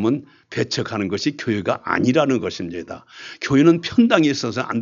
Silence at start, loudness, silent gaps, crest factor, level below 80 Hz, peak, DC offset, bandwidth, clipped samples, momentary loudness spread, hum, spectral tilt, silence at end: 0 s; -20 LUFS; none; 18 dB; -58 dBFS; -2 dBFS; under 0.1%; 7.6 kHz; under 0.1%; 15 LU; none; -5.5 dB/octave; 0 s